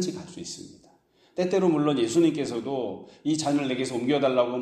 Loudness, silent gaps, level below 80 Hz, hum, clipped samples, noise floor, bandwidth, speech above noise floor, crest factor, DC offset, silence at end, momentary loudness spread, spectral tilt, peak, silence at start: -25 LUFS; none; -68 dBFS; none; under 0.1%; -61 dBFS; 12.5 kHz; 35 dB; 16 dB; under 0.1%; 0 s; 15 LU; -5.5 dB/octave; -10 dBFS; 0 s